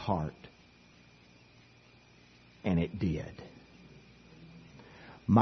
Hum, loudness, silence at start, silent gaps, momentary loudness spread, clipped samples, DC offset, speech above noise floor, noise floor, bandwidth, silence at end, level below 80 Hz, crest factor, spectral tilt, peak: 60 Hz at -65 dBFS; -34 LUFS; 0 s; none; 27 LU; under 0.1%; under 0.1%; 27 dB; -60 dBFS; 6.4 kHz; 0 s; -58 dBFS; 26 dB; -8.5 dB/octave; -8 dBFS